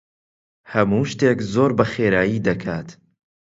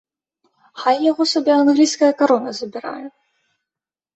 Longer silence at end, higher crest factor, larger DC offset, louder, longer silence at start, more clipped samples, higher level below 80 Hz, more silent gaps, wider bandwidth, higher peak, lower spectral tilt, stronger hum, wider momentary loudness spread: second, 0.6 s vs 1.05 s; about the same, 20 dB vs 16 dB; neither; second, -20 LUFS vs -17 LUFS; about the same, 0.7 s vs 0.75 s; neither; first, -50 dBFS vs -68 dBFS; neither; about the same, 7.8 kHz vs 8.2 kHz; about the same, 0 dBFS vs -2 dBFS; first, -7 dB/octave vs -3 dB/octave; neither; second, 9 LU vs 16 LU